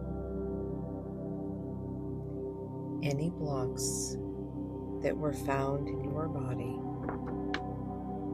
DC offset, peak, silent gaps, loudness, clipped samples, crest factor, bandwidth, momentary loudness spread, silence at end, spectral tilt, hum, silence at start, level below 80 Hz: under 0.1%; -18 dBFS; none; -36 LUFS; under 0.1%; 18 dB; 15 kHz; 7 LU; 0 s; -6 dB/octave; none; 0 s; -50 dBFS